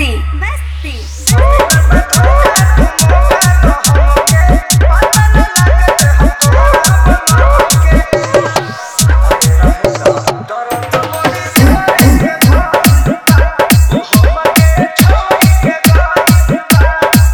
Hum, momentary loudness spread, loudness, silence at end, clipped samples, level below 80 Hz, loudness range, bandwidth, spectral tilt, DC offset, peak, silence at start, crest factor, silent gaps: none; 7 LU; -9 LUFS; 0 s; 0.8%; -12 dBFS; 2 LU; over 20 kHz; -4.5 dB/octave; under 0.1%; 0 dBFS; 0 s; 8 dB; none